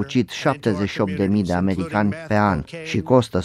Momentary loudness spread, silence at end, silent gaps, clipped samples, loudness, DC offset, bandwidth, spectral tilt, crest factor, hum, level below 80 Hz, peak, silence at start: 4 LU; 0 s; none; under 0.1%; -21 LUFS; under 0.1%; 12 kHz; -7 dB/octave; 18 dB; none; -46 dBFS; -4 dBFS; 0 s